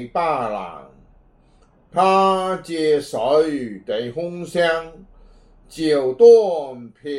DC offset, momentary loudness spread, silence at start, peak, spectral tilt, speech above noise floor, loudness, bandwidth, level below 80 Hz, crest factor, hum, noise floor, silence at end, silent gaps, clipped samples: under 0.1%; 16 LU; 0 s; -2 dBFS; -5.5 dB/octave; 36 dB; -18 LUFS; 11.5 kHz; -54 dBFS; 18 dB; none; -54 dBFS; 0 s; none; under 0.1%